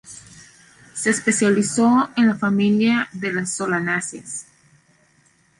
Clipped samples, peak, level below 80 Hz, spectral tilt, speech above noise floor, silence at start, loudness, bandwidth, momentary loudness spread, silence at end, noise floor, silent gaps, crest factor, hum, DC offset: under 0.1%; -4 dBFS; -62 dBFS; -4.5 dB/octave; 40 dB; 0.05 s; -19 LUFS; 11.5 kHz; 15 LU; 1.15 s; -59 dBFS; none; 16 dB; none; under 0.1%